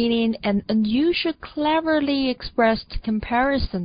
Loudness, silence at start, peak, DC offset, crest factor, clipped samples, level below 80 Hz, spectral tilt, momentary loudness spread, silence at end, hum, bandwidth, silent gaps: -22 LUFS; 0 s; -6 dBFS; under 0.1%; 14 dB; under 0.1%; -38 dBFS; -10.5 dB/octave; 6 LU; 0 s; none; 5.2 kHz; none